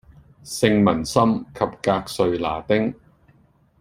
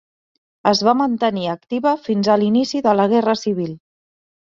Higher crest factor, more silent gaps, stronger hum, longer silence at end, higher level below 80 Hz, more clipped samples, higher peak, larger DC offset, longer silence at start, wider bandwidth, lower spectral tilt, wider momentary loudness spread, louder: about the same, 20 dB vs 16 dB; neither; neither; first, 0.9 s vs 0.75 s; first, -50 dBFS vs -62 dBFS; neither; about the same, -2 dBFS vs -2 dBFS; neither; second, 0.45 s vs 0.65 s; first, 16 kHz vs 7.6 kHz; about the same, -5.5 dB/octave vs -5.5 dB/octave; about the same, 8 LU vs 8 LU; second, -21 LUFS vs -18 LUFS